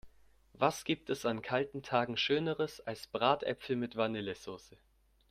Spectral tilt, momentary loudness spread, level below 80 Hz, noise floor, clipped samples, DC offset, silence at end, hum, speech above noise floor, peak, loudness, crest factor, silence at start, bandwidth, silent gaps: -5 dB/octave; 10 LU; -68 dBFS; -64 dBFS; under 0.1%; under 0.1%; 0.7 s; none; 29 dB; -14 dBFS; -34 LUFS; 22 dB; 0.05 s; 15.5 kHz; none